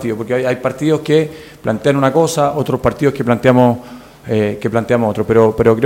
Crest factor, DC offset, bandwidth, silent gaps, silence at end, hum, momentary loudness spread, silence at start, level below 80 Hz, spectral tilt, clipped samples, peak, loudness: 14 dB; under 0.1%; 16.5 kHz; none; 0 s; none; 8 LU; 0 s; -42 dBFS; -6.5 dB/octave; under 0.1%; 0 dBFS; -15 LUFS